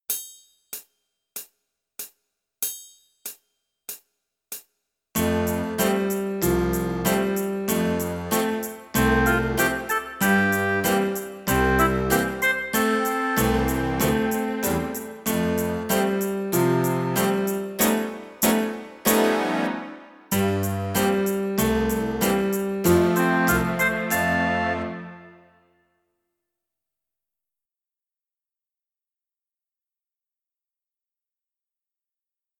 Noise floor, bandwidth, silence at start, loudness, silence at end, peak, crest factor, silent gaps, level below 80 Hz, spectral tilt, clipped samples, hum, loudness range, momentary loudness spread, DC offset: under -90 dBFS; 19.5 kHz; 0.1 s; -23 LUFS; 7.25 s; -4 dBFS; 20 dB; none; -42 dBFS; -4.5 dB/octave; under 0.1%; none; 12 LU; 18 LU; under 0.1%